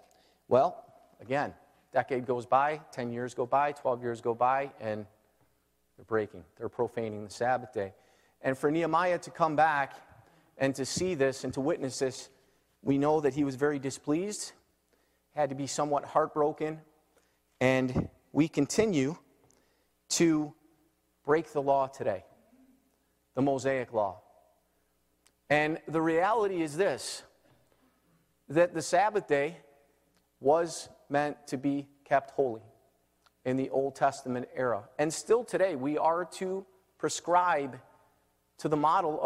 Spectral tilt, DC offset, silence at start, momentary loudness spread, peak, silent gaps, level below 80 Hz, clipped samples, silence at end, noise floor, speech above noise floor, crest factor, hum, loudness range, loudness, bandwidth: -5 dB/octave; under 0.1%; 0.5 s; 11 LU; -12 dBFS; none; -66 dBFS; under 0.1%; 0 s; -73 dBFS; 44 dB; 20 dB; none; 3 LU; -30 LUFS; 15.5 kHz